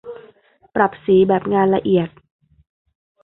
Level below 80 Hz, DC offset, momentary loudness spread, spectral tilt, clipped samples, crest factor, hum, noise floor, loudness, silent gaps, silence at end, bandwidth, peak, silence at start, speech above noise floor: -54 dBFS; under 0.1%; 13 LU; -12 dB/octave; under 0.1%; 18 dB; none; -52 dBFS; -17 LUFS; none; 1.15 s; 4 kHz; 0 dBFS; 0.05 s; 36 dB